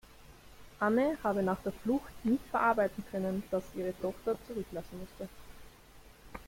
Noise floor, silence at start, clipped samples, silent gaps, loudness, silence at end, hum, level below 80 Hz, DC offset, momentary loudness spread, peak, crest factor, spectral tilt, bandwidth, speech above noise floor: -56 dBFS; 0.1 s; under 0.1%; none; -33 LUFS; 0.05 s; none; -58 dBFS; under 0.1%; 16 LU; -16 dBFS; 18 dB; -7 dB/octave; 16.5 kHz; 23 dB